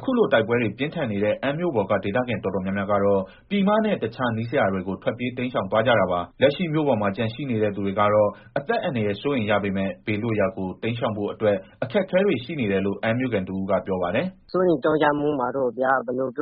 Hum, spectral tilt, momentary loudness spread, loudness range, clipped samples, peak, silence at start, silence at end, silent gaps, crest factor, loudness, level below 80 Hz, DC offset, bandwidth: none; -5 dB/octave; 7 LU; 2 LU; under 0.1%; -6 dBFS; 0 s; 0 s; none; 18 dB; -23 LUFS; -56 dBFS; under 0.1%; 5.2 kHz